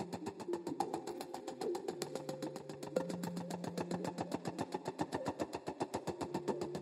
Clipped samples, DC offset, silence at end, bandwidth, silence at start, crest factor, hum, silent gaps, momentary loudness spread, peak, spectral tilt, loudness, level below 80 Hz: under 0.1%; under 0.1%; 0 s; 16 kHz; 0 s; 24 dB; none; none; 4 LU; -18 dBFS; -5.5 dB/octave; -42 LUFS; -76 dBFS